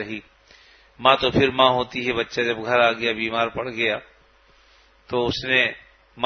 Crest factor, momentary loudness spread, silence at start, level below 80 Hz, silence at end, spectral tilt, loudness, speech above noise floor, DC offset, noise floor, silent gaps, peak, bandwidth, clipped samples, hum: 24 dB; 10 LU; 0 s; -52 dBFS; 0 s; -5 dB/octave; -21 LUFS; 34 dB; under 0.1%; -56 dBFS; none; 0 dBFS; 6.6 kHz; under 0.1%; none